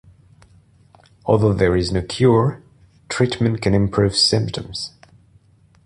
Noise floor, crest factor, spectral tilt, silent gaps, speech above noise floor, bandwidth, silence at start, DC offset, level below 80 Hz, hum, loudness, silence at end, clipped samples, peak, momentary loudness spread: -53 dBFS; 18 dB; -5.5 dB/octave; none; 36 dB; 11.5 kHz; 1.25 s; under 0.1%; -40 dBFS; none; -18 LUFS; 0.95 s; under 0.1%; -2 dBFS; 13 LU